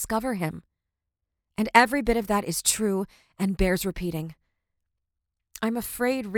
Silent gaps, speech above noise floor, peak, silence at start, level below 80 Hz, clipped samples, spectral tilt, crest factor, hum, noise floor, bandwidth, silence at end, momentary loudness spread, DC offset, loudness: none; 59 dB; -2 dBFS; 0 s; -42 dBFS; under 0.1%; -4 dB/octave; 24 dB; none; -84 dBFS; over 20 kHz; 0 s; 15 LU; under 0.1%; -25 LUFS